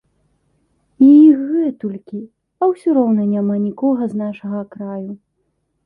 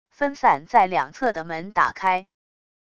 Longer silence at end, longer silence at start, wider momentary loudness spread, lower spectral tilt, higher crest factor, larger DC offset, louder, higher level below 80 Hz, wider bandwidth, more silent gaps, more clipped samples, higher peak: about the same, 0.7 s vs 0.75 s; first, 1 s vs 0.2 s; first, 20 LU vs 8 LU; first, -10.5 dB/octave vs -5 dB/octave; about the same, 14 dB vs 18 dB; second, under 0.1% vs 0.4%; first, -15 LUFS vs -22 LUFS; about the same, -64 dBFS vs -60 dBFS; second, 3.6 kHz vs 8.6 kHz; neither; neither; about the same, -2 dBFS vs -4 dBFS